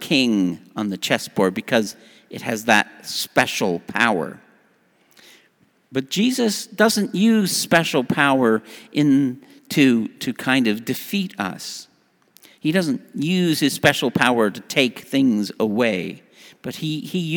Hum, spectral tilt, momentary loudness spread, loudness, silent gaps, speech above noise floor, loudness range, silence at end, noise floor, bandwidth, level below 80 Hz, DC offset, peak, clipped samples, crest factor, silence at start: none; -4.5 dB/octave; 10 LU; -20 LUFS; none; 40 dB; 5 LU; 0 s; -60 dBFS; over 20 kHz; -64 dBFS; under 0.1%; 0 dBFS; under 0.1%; 20 dB; 0 s